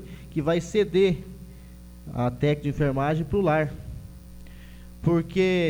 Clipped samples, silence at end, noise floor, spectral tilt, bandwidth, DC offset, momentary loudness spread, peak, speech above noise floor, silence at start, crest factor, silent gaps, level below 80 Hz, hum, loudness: under 0.1%; 0 s; -44 dBFS; -7 dB/octave; 18.5 kHz; under 0.1%; 23 LU; -10 dBFS; 21 dB; 0 s; 16 dB; none; -44 dBFS; 60 Hz at -45 dBFS; -25 LUFS